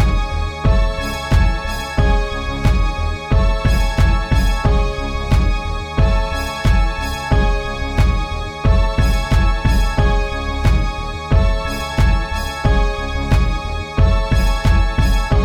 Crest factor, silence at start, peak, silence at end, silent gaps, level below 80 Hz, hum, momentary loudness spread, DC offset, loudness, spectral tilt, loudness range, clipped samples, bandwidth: 14 dB; 0 s; -2 dBFS; 0 s; none; -16 dBFS; none; 6 LU; 0.4%; -18 LUFS; -6 dB/octave; 1 LU; under 0.1%; 13 kHz